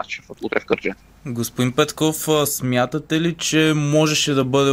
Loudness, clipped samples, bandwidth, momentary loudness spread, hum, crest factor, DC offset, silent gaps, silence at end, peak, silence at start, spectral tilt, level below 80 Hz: -19 LUFS; under 0.1%; 16 kHz; 11 LU; none; 16 dB; under 0.1%; none; 0 s; -4 dBFS; 0 s; -4.5 dB/octave; -52 dBFS